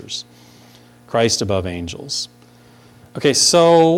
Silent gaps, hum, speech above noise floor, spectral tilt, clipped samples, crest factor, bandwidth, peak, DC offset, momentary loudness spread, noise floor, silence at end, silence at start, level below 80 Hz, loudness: none; 60 Hz at -50 dBFS; 32 dB; -3.5 dB/octave; under 0.1%; 16 dB; 16 kHz; -2 dBFS; under 0.1%; 18 LU; -47 dBFS; 0 s; 0.05 s; -50 dBFS; -16 LUFS